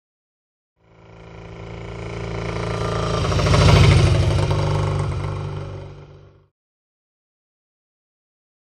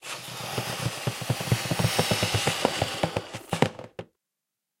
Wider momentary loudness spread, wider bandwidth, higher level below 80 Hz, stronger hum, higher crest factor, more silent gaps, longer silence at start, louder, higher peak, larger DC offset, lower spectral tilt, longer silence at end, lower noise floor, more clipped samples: first, 22 LU vs 10 LU; second, 11 kHz vs 16 kHz; first, -30 dBFS vs -54 dBFS; neither; about the same, 22 dB vs 26 dB; neither; first, 1.15 s vs 0 s; first, -19 LUFS vs -27 LUFS; about the same, 0 dBFS vs -2 dBFS; neither; first, -6 dB/octave vs -4 dB/octave; first, 2.6 s vs 0.75 s; second, -45 dBFS vs -85 dBFS; neither